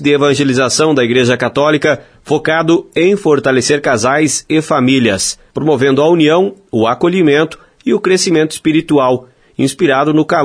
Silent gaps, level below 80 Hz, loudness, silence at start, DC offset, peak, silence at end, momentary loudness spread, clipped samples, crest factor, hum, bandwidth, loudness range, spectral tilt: none; -50 dBFS; -12 LUFS; 0 s; under 0.1%; 0 dBFS; 0 s; 6 LU; under 0.1%; 12 dB; none; 11 kHz; 1 LU; -4.5 dB/octave